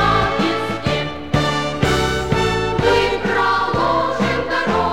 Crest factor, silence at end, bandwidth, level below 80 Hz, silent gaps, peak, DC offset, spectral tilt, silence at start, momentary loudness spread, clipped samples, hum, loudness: 14 dB; 0 s; 16.5 kHz; -34 dBFS; none; -2 dBFS; 1%; -5 dB/octave; 0 s; 4 LU; under 0.1%; none; -18 LUFS